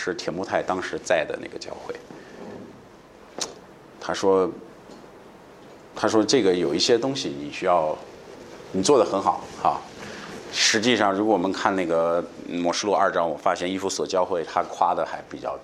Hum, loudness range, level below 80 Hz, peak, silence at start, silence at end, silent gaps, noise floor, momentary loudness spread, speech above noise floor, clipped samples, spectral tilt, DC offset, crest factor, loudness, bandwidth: none; 7 LU; -62 dBFS; -2 dBFS; 0 s; 0 s; none; -48 dBFS; 20 LU; 25 dB; under 0.1%; -3.5 dB/octave; under 0.1%; 22 dB; -23 LUFS; 13 kHz